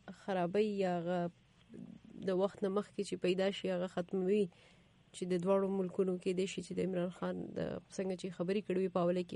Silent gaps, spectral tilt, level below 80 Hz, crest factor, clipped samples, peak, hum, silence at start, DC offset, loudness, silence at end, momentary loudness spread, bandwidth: none; -6.5 dB/octave; -72 dBFS; 16 dB; under 0.1%; -22 dBFS; none; 0.05 s; under 0.1%; -37 LUFS; 0 s; 8 LU; 11 kHz